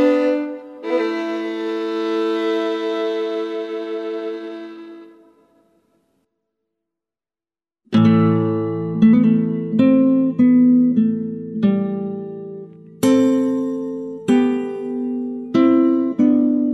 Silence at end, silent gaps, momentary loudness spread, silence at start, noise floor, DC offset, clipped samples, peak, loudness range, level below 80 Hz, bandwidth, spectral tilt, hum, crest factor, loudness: 0 s; none; 14 LU; 0 s; under -90 dBFS; under 0.1%; under 0.1%; -2 dBFS; 12 LU; -62 dBFS; 12 kHz; -7.5 dB/octave; none; 16 dB; -18 LUFS